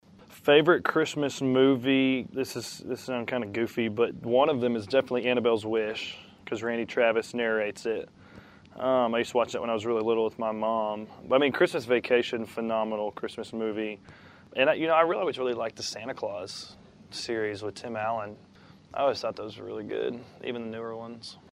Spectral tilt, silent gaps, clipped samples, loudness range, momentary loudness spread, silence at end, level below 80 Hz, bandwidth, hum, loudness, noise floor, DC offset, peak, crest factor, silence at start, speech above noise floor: -5 dB/octave; none; under 0.1%; 6 LU; 14 LU; 0.2 s; -68 dBFS; 14.5 kHz; none; -28 LUFS; -51 dBFS; under 0.1%; -6 dBFS; 22 dB; 0.2 s; 23 dB